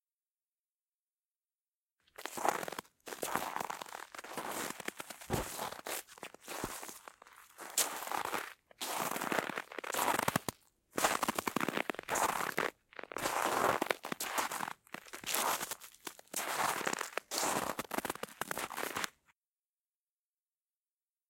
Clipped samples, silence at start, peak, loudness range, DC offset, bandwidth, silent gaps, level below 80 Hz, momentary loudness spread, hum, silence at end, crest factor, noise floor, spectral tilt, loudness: under 0.1%; 2.2 s; -10 dBFS; 7 LU; under 0.1%; 17 kHz; none; -68 dBFS; 14 LU; none; 2.2 s; 30 dB; under -90 dBFS; -2 dB/octave; -37 LUFS